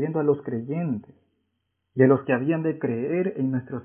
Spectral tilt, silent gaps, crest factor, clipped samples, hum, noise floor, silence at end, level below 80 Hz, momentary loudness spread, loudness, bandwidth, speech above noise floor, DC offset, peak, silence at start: -13 dB/octave; none; 20 dB; under 0.1%; none; -76 dBFS; 0 s; -66 dBFS; 10 LU; -24 LUFS; 3.4 kHz; 53 dB; under 0.1%; -4 dBFS; 0 s